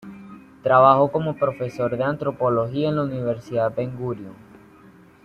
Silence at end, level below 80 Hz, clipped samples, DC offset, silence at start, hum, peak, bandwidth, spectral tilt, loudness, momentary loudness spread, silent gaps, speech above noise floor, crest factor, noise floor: 0.9 s; -58 dBFS; under 0.1%; under 0.1%; 0.05 s; none; -2 dBFS; 8.6 kHz; -8.5 dB/octave; -21 LUFS; 15 LU; none; 28 dB; 20 dB; -49 dBFS